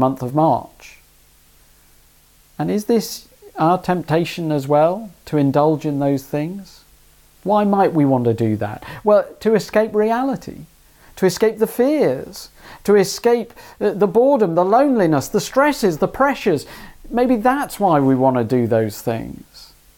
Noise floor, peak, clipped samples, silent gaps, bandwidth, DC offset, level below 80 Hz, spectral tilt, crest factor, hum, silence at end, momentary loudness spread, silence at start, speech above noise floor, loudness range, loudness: -52 dBFS; -2 dBFS; under 0.1%; none; 18 kHz; under 0.1%; -50 dBFS; -6.5 dB/octave; 16 dB; none; 0.35 s; 13 LU; 0 s; 35 dB; 5 LU; -18 LUFS